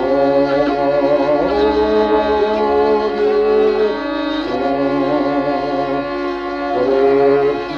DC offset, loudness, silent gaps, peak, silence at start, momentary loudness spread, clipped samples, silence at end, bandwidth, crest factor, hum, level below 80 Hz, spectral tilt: under 0.1%; -16 LUFS; none; -4 dBFS; 0 s; 6 LU; under 0.1%; 0 s; 6.8 kHz; 12 dB; none; -42 dBFS; -7 dB/octave